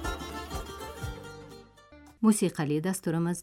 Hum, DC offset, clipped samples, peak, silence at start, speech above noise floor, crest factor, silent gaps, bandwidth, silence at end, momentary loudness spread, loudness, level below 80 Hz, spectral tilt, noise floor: none; under 0.1%; under 0.1%; -12 dBFS; 0 s; 27 dB; 18 dB; none; 16.5 kHz; 0 s; 21 LU; -30 LUFS; -46 dBFS; -5.5 dB/octave; -54 dBFS